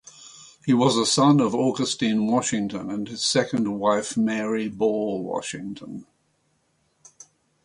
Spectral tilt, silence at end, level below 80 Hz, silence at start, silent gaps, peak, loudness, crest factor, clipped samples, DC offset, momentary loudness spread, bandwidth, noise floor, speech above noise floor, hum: -4.5 dB/octave; 1.6 s; -64 dBFS; 0.2 s; none; -6 dBFS; -23 LUFS; 18 dB; under 0.1%; under 0.1%; 17 LU; 11.5 kHz; -68 dBFS; 46 dB; none